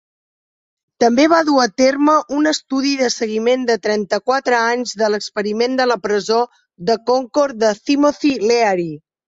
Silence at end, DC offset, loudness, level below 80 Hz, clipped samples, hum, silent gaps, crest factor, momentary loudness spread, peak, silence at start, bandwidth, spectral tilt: 0.3 s; under 0.1%; -16 LUFS; -60 dBFS; under 0.1%; none; none; 14 dB; 6 LU; -2 dBFS; 1 s; 8 kHz; -3.5 dB/octave